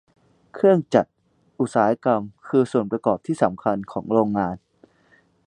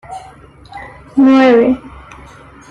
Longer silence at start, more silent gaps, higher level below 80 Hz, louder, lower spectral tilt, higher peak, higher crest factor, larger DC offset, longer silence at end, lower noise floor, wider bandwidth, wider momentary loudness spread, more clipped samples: first, 0.55 s vs 0.1 s; neither; second, -60 dBFS vs -44 dBFS; second, -22 LUFS vs -11 LUFS; about the same, -7.5 dB/octave vs -6.5 dB/octave; about the same, -2 dBFS vs -2 dBFS; first, 20 dB vs 12 dB; neither; about the same, 0.9 s vs 0.85 s; first, -59 dBFS vs -39 dBFS; first, 10 kHz vs 7 kHz; second, 9 LU vs 24 LU; neither